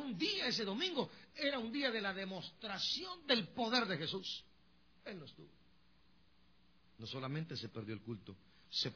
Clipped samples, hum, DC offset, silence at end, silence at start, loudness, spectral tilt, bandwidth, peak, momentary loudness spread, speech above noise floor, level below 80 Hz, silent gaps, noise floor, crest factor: under 0.1%; none; under 0.1%; 0 s; 0 s; -39 LUFS; -2 dB/octave; 5.4 kHz; -22 dBFS; 16 LU; 31 dB; -76 dBFS; none; -72 dBFS; 20 dB